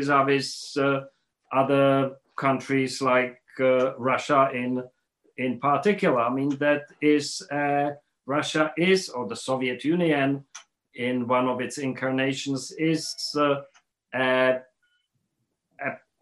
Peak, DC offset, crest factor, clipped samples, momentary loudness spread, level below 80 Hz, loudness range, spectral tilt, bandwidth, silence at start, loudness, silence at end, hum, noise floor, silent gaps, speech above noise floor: -6 dBFS; under 0.1%; 18 dB; under 0.1%; 10 LU; -74 dBFS; 3 LU; -5 dB/octave; 12.5 kHz; 0 s; -25 LUFS; 0.25 s; none; -78 dBFS; none; 54 dB